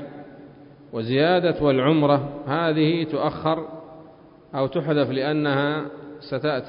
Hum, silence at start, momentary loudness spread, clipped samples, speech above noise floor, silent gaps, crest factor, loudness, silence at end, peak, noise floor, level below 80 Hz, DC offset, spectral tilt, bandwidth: none; 0 s; 16 LU; under 0.1%; 26 dB; none; 18 dB; -22 LUFS; 0 s; -6 dBFS; -48 dBFS; -56 dBFS; under 0.1%; -11.5 dB/octave; 5.4 kHz